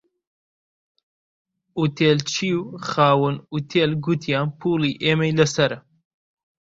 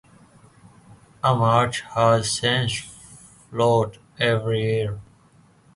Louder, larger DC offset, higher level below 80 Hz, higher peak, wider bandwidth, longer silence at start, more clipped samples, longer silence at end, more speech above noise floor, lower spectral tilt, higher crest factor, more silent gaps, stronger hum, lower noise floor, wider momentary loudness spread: about the same, -21 LUFS vs -22 LUFS; neither; second, -58 dBFS vs -52 dBFS; first, -2 dBFS vs -6 dBFS; second, 7.8 kHz vs 11.5 kHz; first, 1.75 s vs 0.9 s; neither; about the same, 0.85 s vs 0.75 s; first, over 69 dB vs 35 dB; about the same, -5.5 dB/octave vs -4.5 dB/octave; about the same, 20 dB vs 18 dB; neither; neither; first, under -90 dBFS vs -55 dBFS; second, 8 LU vs 12 LU